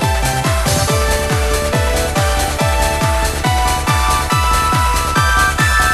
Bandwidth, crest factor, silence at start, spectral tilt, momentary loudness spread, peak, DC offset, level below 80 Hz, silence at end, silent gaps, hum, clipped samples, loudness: 13 kHz; 12 dB; 0 s; -3.5 dB/octave; 3 LU; -2 dBFS; 0.3%; -20 dBFS; 0 s; none; none; under 0.1%; -14 LUFS